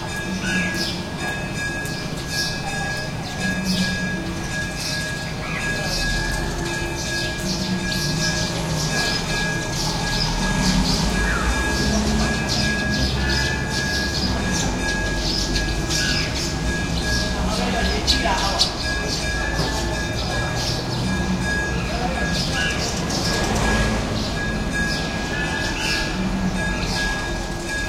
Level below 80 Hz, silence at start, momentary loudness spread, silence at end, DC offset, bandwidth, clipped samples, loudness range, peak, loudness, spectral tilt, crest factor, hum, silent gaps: -30 dBFS; 0 s; 5 LU; 0 s; under 0.1%; 16.5 kHz; under 0.1%; 3 LU; -4 dBFS; -22 LUFS; -3.5 dB/octave; 20 dB; none; none